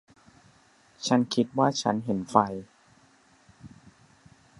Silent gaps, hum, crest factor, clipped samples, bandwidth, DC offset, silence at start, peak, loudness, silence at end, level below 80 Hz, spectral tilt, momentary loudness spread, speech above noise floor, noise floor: none; none; 26 dB; under 0.1%; 11.5 kHz; under 0.1%; 1 s; -4 dBFS; -26 LUFS; 0.95 s; -66 dBFS; -5 dB/octave; 8 LU; 35 dB; -60 dBFS